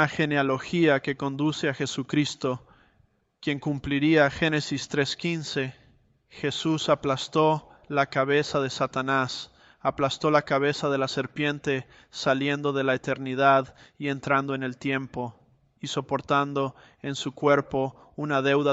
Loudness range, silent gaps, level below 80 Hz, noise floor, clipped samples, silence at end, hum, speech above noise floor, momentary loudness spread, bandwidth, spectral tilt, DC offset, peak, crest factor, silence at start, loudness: 3 LU; none; -58 dBFS; -66 dBFS; under 0.1%; 0 s; none; 40 dB; 10 LU; 8.2 kHz; -5.5 dB/octave; under 0.1%; -6 dBFS; 20 dB; 0 s; -26 LUFS